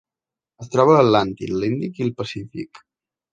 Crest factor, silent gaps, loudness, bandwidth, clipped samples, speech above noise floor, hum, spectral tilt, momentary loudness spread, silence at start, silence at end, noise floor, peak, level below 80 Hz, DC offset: 20 dB; none; -19 LUFS; 9 kHz; under 0.1%; 70 dB; none; -7 dB/octave; 19 LU; 0.6 s; 0.55 s; -89 dBFS; -2 dBFS; -54 dBFS; under 0.1%